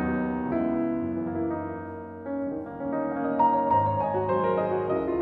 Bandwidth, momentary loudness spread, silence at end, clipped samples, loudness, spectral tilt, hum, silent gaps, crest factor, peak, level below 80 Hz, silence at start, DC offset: 4.7 kHz; 11 LU; 0 s; under 0.1%; -27 LUFS; -11 dB/octave; none; none; 16 dB; -12 dBFS; -54 dBFS; 0 s; under 0.1%